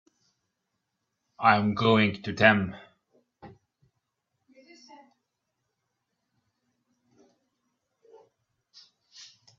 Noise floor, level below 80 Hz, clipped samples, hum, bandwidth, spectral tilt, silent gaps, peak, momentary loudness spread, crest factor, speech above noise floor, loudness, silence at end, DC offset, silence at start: -82 dBFS; -68 dBFS; under 0.1%; none; 7.4 kHz; -6.5 dB/octave; none; -4 dBFS; 10 LU; 28 dB; 58 dB; -23 LUFS; 0.35 s; under 0.1%; 1.4 s